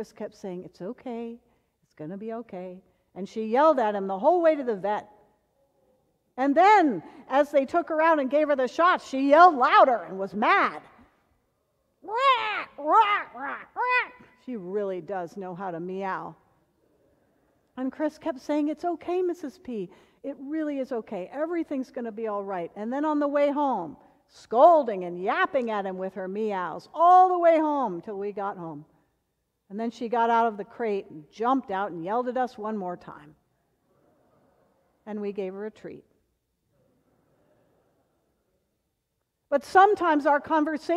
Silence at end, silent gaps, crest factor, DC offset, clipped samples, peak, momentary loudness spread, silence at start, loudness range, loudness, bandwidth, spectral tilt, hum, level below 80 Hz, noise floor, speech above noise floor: 0 s; none; 22 dB; under 0.1%; under 0.1%; -4 dBFS; 20 LU; 0 s; 16 LU; -25 LUFS; 11 kHz; -5.5 dB/octave; none; -72 dBFS; -79 dBFS; 54 dB